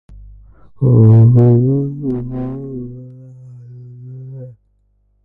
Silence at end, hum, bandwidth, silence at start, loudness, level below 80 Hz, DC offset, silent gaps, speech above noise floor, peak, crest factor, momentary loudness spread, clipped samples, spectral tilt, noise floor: 0.75 s; none; 1.9 kHz; 0.15 s; -12 LUFS; -40 dBFS; under 0.1%; none; 48 dB; 0 dBFS; 14 dB; 26 LU; under 0.1%; -13.5 dB/octave; -59 dBFS